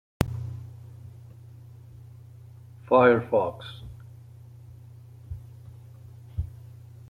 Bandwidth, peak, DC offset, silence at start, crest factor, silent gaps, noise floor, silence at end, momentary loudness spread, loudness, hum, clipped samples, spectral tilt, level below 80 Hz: 16.5 kHz; -4 dBFS; under 0.1%; 0.2 s; 26 dB; none; -47 dBFS; 0.45 s; 27 LU; -25 LUFS; none; under 0.1%; -7 dB/octave; -48 dBFS